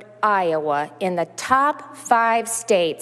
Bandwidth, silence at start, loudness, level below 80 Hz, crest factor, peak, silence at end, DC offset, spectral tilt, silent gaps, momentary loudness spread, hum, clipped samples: 13.5 kHz; 0 s; -20 LUFS; -64 dBFS; 18 dB; -2 dBFS; 0 s; under 0.1%; -3 dB/octave; none; 7 LU; none; under 0.1%